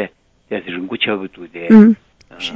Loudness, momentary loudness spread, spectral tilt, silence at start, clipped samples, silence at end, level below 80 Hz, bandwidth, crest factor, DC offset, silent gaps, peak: -13 LUFS; 19 LU; -7 dB/octave; 0 s; 0.5%; 0 s; -56 dBFS; 6.6 kHz; 16 dB; under 0.1%; none; 0 dBFS